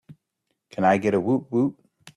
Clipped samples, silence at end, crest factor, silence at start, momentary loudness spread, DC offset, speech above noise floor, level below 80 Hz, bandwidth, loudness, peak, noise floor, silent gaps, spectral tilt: under 0.1%; 0.45 s; 18 dB; 0.1 s; 7 LU; under 0.1%; 56 dB; -64 dBFS; 11 kHz; -23 LUFS; -8 dBFS; -78 dBFS; none; -7.5 dB/octave